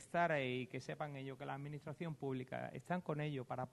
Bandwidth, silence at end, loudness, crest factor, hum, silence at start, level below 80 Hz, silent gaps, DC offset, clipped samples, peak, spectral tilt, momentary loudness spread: 12 kHz; 0.05 s; -43 LUFS; 20 dB; none; 0 s; -78 dBFS; none; under 0.1%; under 0.1%; -22 dBFS; -6.5 dB/octave; 10 LU